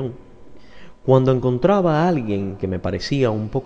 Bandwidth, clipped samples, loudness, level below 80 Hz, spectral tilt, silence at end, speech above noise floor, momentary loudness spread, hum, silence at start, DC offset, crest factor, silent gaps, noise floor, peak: 7.6 kHz; under 0.1%; -19 LUFS; -44 dBFS; -8 dB/octave; 0 s; 26 dB; 9 LU; none; 0 s; under 0.1%; 18 dB; none; -44 dBFS; -2 dBFS